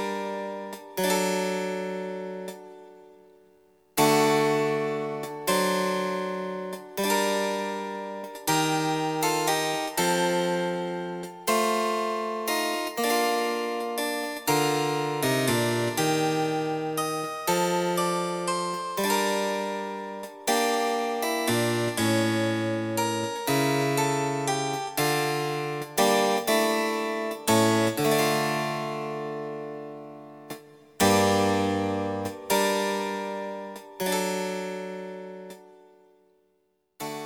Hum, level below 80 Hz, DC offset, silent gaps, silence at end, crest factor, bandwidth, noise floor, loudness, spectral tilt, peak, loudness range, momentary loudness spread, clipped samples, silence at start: none; -68 dBFS; under 0.1%; none; 0 s; 20 dB; over 20 kHz; -71 dBFS; -26 LUFS; -4 dB/octave; -8 dBFS; 4 LU; 12 LU; under 0.1%; 0 s